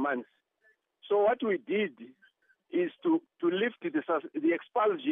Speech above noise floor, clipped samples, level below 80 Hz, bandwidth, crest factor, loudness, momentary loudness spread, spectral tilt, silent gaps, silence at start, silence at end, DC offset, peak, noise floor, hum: 41 dB; under 0.1%; -82 dBFS; 3.8 kHz; 16 dB; -30 LUFS; 6 LU; -8.5 dB/octave; none; 0 s; 0 s; under 0.1%; -16 dBFS; -70 dBFS; none